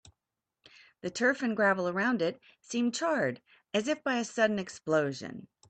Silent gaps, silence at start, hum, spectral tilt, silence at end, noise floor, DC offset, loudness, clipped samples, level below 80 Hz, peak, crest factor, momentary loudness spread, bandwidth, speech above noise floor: none; 1.05 s; none; -4.5 dB/octave; 0.25 s; -89 dBFS; under 0.1%; -30 LUFS; under 0.1%; -74 dBFS; -14 dBFS; 18 dB; 13 LU; 9 kHz; 58 dB